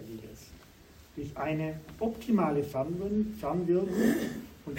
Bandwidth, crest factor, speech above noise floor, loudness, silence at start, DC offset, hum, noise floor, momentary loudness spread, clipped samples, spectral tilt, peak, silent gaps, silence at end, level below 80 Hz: 16 kHz; 18 dB; 25 dB; -31 LUFS; 0 s; under 0.1%; none; -55 dBFS; 18 LU; under 0.1%; -7 dB/octave; -14 dBFS; none; 0 s; -56 dBFS